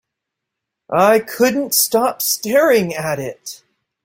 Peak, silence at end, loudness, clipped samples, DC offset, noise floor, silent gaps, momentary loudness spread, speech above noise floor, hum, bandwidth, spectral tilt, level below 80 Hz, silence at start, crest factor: -2 dBFS; 0.5 s; -16 LUFS; under 0.1%; under 0.1%; -80 dBFS; none; 12 LU; 64 dB; none; 16.5 kHz; -3 dB/octave; -60 dBFS; 0.9 s; 16 dB